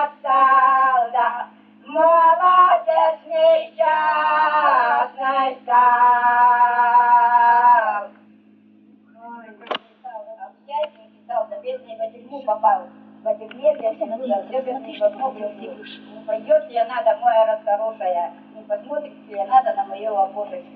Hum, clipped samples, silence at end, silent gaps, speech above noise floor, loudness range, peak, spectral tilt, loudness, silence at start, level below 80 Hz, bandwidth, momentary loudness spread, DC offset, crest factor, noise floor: none; under 0.1%; 0.15 s; none; 30 dB; 13 LU; -2 dBFS; 0 dB/octave; -18 LUFS; 0 s; -80 dBFS; 4.8 kHz; 17 LU; under 0.1%; 16 dB; -51 dBFS